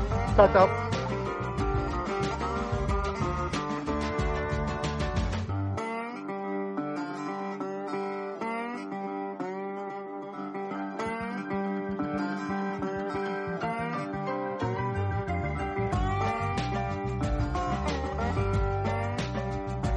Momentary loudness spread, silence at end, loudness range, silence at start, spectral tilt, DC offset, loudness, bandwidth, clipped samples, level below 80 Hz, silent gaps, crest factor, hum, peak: 6 LU; 0 s; 5 LU; 0 s; -7 dB/octave; under 0.1%; -30 LUFS; 10.5 kHz; under 0.1%; -40 dBFS; none; 24 dB; none; -6 dBFS